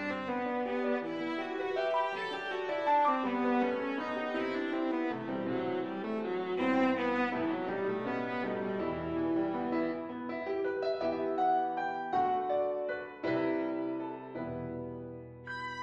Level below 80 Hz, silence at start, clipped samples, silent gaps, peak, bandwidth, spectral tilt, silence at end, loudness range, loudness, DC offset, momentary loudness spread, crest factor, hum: -68 dBFS; 0 s; under 0.1%; none; -18 dBFS; 8 kHz; -7 dB/octave; 0 s; 2 LU; -33 LUFS; under 0.1%; 9 LU; 16 dB; none